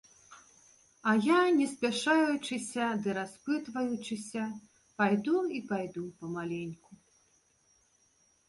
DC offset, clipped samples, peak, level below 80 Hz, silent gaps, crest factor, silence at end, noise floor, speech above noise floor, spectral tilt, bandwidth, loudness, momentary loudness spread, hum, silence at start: under 0.1%; under 0.1%; -14 dBFS; -74 dBFS; none; 18 dB; 1.55 s; -69 dBFS; 39 dB; -5 dB/octave; 11.5 kHz; -31 LUFS; 14 LU; none; 0.3 s